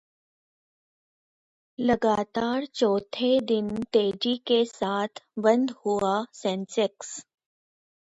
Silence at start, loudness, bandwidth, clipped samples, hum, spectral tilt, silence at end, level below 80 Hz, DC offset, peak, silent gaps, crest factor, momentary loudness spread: 1.8 s; -26 LUFS; 8 kHz; under 0.1%; none; -4.5 dB/octave; 0.9 s; -64 dBFS; under 0.1%; -8 dBFS; none; 20 dB; 7 LU